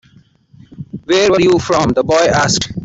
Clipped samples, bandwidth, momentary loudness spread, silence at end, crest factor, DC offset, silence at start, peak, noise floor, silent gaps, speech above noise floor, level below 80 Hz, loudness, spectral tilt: under 0.1%; 8.2 kHz; 19 LU; 0 s; 12 dB; under 0.1%; 0.8 s; -2 dBFS; -48 dBFS; none; 36 dB; -42 dBFS; -12 LUFS; -4 dB/octave